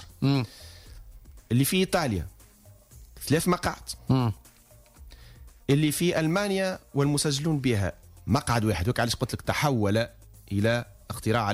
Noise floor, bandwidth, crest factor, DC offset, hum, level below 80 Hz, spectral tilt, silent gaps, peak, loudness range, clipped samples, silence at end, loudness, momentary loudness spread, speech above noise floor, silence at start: -55 dBFS; 16 kHz; 14 dB; under 0.1%; none; -48 dBFS; -5.5 dB/octave; none; -12 dBFS; 3 LU; under 0.1%; 0 s; -26 LUFS; 13 LU; 29 dB; 0 s